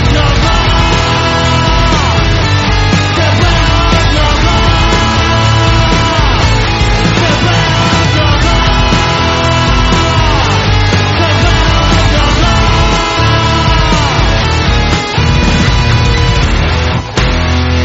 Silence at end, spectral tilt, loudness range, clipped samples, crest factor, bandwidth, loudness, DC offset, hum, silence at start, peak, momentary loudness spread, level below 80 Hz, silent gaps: 0 s; -5 dB/octave; 1 LU; 0.1%; 8 dB; 8 kHz; -9 LUFS; under 0.1%; none; 0 s; 0 dBFS; 1 LU; -14 dBFS; none